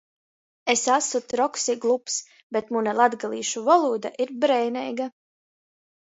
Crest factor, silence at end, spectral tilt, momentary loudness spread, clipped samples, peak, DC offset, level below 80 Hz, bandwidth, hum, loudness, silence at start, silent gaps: 20 dB; 0.95 s; -2 dB/octave; 10 LU; under 0.1%; -4 dBFS; under 0.1%; -76 dBFS; 8 kHz; none; -24 LUFS; 0.65 s; 2.43-2.50 s